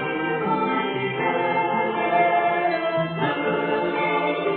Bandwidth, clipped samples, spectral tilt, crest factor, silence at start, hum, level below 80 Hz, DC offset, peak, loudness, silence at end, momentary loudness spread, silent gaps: 4.4 kHz; under 0.1%; -10 dB/octave; 14 dB; 0 s; none; -62 dBFS; under 0.1%; -8 dBFS; -22 LUFS; 0 s; 4 LU; none